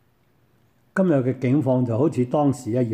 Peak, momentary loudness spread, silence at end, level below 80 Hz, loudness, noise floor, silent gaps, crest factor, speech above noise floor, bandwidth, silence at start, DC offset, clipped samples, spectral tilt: -8 dBFS; 3 LU; 0 s; -66 dBFS; -22 LUFS; -63 dBFS; none; 14 dB; 42 dB; 11 kHz; 0.95 s; under 0.1%; under 0.1%; -8.5 dB/octave